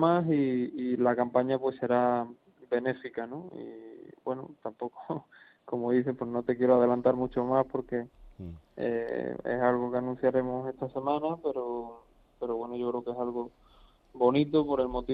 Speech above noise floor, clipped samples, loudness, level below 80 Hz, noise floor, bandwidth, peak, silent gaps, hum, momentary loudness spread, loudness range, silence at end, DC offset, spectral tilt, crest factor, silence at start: 30 dB; under 0.1%; -30 LUFS; -58 dBFS; -60 dBFS; 4.9 kHz; -12 dBFS; none; none; 16 LU; 7 LU; 0 s; under 0.1%; -10 dB/octave; 18 dB; 0 s